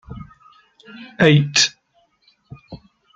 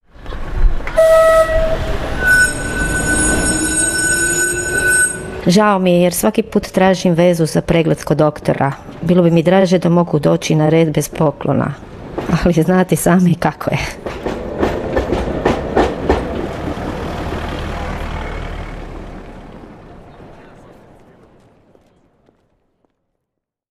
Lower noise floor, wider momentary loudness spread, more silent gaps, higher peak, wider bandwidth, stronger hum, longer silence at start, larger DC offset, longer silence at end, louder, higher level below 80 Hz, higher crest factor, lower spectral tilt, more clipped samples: second, -62 dBFS vs -78 dBFS; first, 26 LU vs 13 LU; neither; about the same, -2 dBFS vs -2 dBFS; second, 9.2 kHz vs 15.5 kHz; neither; about the same, 0.1 s vs 0.2 s; neither; second, 0.4 s vs 3.3 s; about the same, -15 LUFS vs -15 LUFS; second, -52 dBFS vs -28 dBFS; first, 20 dB vs 14 dB; about the same, -4 dB/octave vs -5 dB/octave; neither